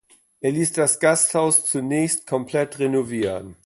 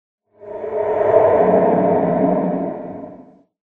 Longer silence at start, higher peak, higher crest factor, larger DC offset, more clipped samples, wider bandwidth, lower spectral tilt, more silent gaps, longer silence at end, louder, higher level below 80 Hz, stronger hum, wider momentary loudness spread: about the same, 0.45 s vs 0.4 s; second, -4 dBFS vs 0 dBFS; about the same, 18 dB vs 18 dB; neither; neither; first, 12 kHz vs 3.8 kHz; second, -4 dB/octave vs -11 dB/octave; neither; second, 0.15 s vs 0.55 s; second, -20 LUFS vs -16 LUFS; about the same, -58 dBFS vs -54 dBFS; neither; second, 8 LU vs 19 LU